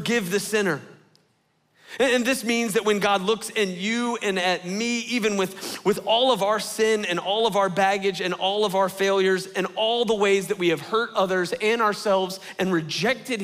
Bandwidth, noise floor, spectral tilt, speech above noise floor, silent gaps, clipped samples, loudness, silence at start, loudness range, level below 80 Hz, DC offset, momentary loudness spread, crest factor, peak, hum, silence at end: 16 kHz; -67 dBFS; -3.5 dB/octave; 44 dB; none; under 0.1%; -23 LUFS; 0 s; 2 LU; -64 dBFS; under 0.1%; 5 LU; 16 dB; -8 dBFS; none; 0 s